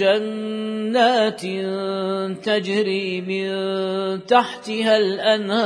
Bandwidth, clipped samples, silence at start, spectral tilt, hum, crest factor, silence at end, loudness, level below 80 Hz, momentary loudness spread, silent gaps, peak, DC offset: 11 kHz; under 0.1%; 0 s; -5 dB/octave; none; 18 dB; 0 s; -21 LUFS; -72 dBFS; 8 LU; none; -2 dBFS; under 0.1%